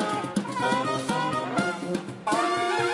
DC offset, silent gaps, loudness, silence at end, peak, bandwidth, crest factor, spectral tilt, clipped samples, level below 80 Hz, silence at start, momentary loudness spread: under 0.1%; none; -27 LUFS; 0 s; -10 dBFS; 11.5 kHz; 16 dB; -4.5 dB/octave; under 0.1%; -66 dBFS; 0 s; 5 LU